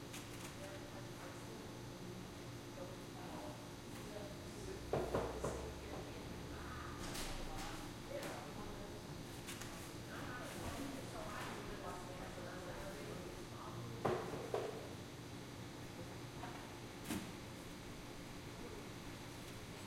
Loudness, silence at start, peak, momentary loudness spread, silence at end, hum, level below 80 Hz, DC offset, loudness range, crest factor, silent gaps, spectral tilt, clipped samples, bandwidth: -48 LUFS; 0 s; -22 dBFS; 7 LU; 0 s; none; -58 dBFS; under 0.1%; 4 LU; 26 dB; none; -4.5 dB/octave; under 0.1%; 16.5 kHz